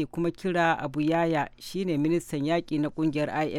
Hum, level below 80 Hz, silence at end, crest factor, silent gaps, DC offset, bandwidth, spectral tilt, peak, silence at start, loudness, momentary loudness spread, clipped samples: none; -56 dBFS; 0 s; 16 dB; none; under 0.1%; 15 kHz; -6.5 dB/octave; -10 dBFS; 0 s; -27 LUFS; 5 LU; under 0.1%